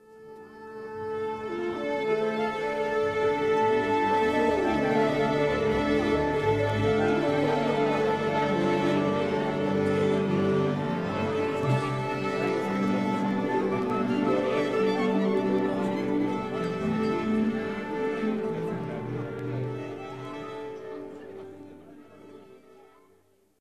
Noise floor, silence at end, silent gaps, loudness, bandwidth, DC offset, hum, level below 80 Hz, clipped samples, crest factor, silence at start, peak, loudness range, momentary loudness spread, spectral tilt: -64 dBFS; 1.05 s; none; -27 LUFS; 12.5 kHz; 0.1%; none; -54 dBFS; under 0.1%; 14 dB; 0.1 s; -12 dBFS; 10 LU; 13 LU; -7 dB/octave